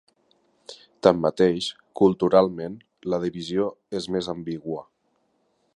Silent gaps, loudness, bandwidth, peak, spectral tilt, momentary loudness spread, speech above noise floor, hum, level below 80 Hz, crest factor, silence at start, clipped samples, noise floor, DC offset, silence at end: none; -24 LUFS; 11 kHz; -2 dBFS; -6.5 dB/octave; 16 LU; 47 dB; none; -58 dBFS; 24 dB; 0.7 s; under 0.1%; -70 dBFS; under 0.1%; 0.95 s